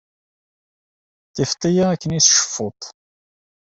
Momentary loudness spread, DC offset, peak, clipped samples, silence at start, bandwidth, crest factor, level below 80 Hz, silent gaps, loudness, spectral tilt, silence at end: 22 LU; under 0.1%; 0 dBFS; under 0.1%; 1.35 s; 8.2 kHz; 22 dB; -54 dBFS; none; -17 LUFS; -3 dB/octave; 0.8 s